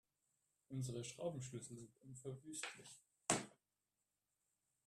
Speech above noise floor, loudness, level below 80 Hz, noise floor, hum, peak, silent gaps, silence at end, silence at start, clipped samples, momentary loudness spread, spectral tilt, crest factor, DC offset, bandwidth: over 40 dB; -47 LUFS; -80 dBFS; under -90 dBFS; 50 Hz at -85 dBFS; -20 dBFS; none; 1.35 s; 0.7 s; under 0.1%; 17 LU; -3.5 dB/octave; 30 dB; under 0.1%; 13.5 kHz